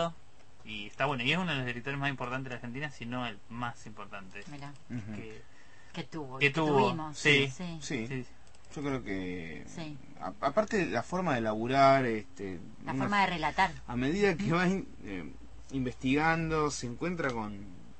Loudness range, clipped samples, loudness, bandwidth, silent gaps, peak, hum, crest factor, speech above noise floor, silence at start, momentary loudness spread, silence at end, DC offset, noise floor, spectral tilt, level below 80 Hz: 9 LU; under 0.1%; -31 LUFS; 8.8 kHz; none; -10 dBFS; none; 22 dB; 28 dB; 0 s; 17 LU; 0.1 s; 0.5%; -60 dBFS; -5 dB/octave; -56 dBFS